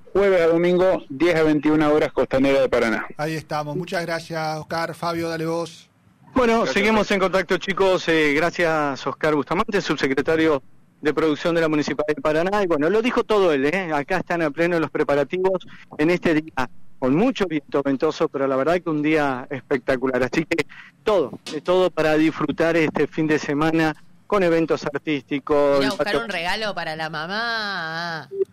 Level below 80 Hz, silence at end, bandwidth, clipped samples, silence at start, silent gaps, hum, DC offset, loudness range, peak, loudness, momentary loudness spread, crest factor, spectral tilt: -48 dBFS; 0.1 s; 15 kHz; under 0.1%; 0 s; none; none; under 0.1%; 3 LU; -10 dBFS; -21 LUFS; 9 LU; 10 dB; -5.5 dB/octave